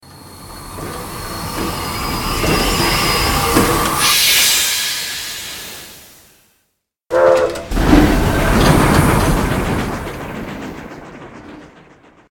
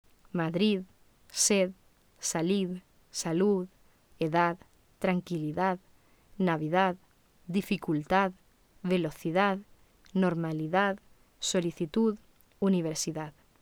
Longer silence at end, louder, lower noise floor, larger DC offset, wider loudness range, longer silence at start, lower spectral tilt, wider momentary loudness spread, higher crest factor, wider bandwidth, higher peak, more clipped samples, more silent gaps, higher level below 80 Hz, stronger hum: first, 0.65 s vs 0.3 s; first, -14 LUFS vs -30 LUFS; first, -68 dBFS vs -60 dBFS; neither; first, 6 LU vs 1 LU; second, 0.1 s vs 0.35 s; about the same, -3.5 dB/octave vs -4.5 dB/octave; first, 21 LU vs 12 LU; about the same, 16 dB vs 20 dB; about the same, 17.5 kHz vs 19 kHz; first, 0 dBFS vs -12 dBFS; neither; neither; first, -26 dBFS vs -64 dBFS; neither